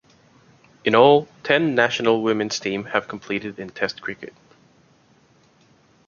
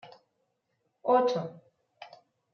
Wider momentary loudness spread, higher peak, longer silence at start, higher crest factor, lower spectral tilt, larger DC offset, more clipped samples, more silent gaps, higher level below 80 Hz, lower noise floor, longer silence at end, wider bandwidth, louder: second, 17 LU vs 25 LU; first, -2 dBFS vs -12 dBFS; first, 0.85 s vs 0.05 s; about the same, 22 dB vs 20 dB; about the same, -4.5 dB/octave vs -4.5 dB/octave; neither; neither; neither; first, -64 dBFS vs -88 dBFS; second, -57 dBFS vs -78 dBFS; first, 1.8 s vs 0.5 s; first, 7.4 kHz vs 6.6 kHz; first, -20 LUFS vs -28 LUFS